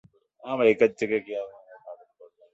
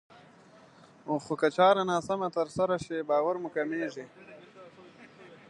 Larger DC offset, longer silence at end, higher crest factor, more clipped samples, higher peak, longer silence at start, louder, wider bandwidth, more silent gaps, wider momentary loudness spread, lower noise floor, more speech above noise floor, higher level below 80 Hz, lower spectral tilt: neither; first, 0.6 s vs 0.15 s; about the same, 20 dB vs 20 dB; neither; about the same, -8 dBFS vs -10 dBFS; second, 0.45 s vs 1.05 s; first, -25 LUFS vs -29 LUFS; second, 7.8 kHz vs 11 kHz; neither; about the same, 25 LU vs 24 LU; about the same, -55 dBFS vs -56 dBFS; about the same, 31 dB vs 28 dB; about the same, -72 dBFS vs -70 dBFS; about the same, -6 dB/octave vs -5.5 dB/octave